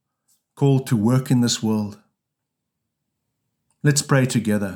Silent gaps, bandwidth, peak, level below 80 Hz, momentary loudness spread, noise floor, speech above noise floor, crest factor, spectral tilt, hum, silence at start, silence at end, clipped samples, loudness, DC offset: none; 17 kHz; -4 dBFS; -68 dBFS; 5 LU; -81 dBFS; 62 dB; 18 dB; -5.5 dB/octave; none; 0.6 s; 0 s; under 0.1%; -20 LUFS; under 0.1%